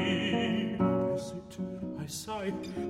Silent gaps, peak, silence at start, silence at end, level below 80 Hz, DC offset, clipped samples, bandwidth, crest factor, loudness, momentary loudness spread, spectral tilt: none; -18 dBFS; 0 s; 0 s; -60 dBFS; under 0.1%; under 0.1%; 15.5 kHz; 14 dB; -33 LUFS; 10 LU; -5.5 dB/octave